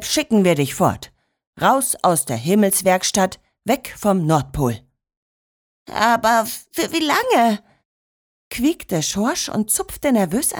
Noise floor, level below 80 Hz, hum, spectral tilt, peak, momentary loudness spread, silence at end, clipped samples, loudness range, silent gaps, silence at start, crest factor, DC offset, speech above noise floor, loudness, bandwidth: under -90 dBFS; -46 dBFS; none; -4 dB/octave; -4 dBFS; 7 LU; 0 s; under 0.1%; 3 LU; 1.47-1.53 s, 5.17-5.86 s, 7.85-8.51 s; 0 s; 16 dB; under 0.1%; over 72 dB; -18 LUFS; over 20 kHz